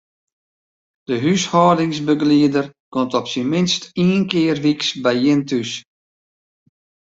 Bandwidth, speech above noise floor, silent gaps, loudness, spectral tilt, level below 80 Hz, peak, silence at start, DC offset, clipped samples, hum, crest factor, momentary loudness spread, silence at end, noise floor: 7.8 kHz; over 73 dB; 2.80-2.92 s; -18 LUFS; -5.5 dB/octave; -58 dBFS; -2 dBFS; 1.1 s; under 0.1%; under 0.1%; none; 18 dB; 8 LU; 1.35 s; under -90 dBFS